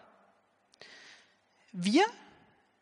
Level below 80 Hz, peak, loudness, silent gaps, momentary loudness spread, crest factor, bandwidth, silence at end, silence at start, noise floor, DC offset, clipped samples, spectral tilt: -86 dBFS; -14 dBFS; -29 LUFS; none; 26 LU; 22 dB; 10.5 kHz; 0.7 s; 1.75 s; -69 dBFS; under 0.1%; under 0.1%; -4.5 dB/octave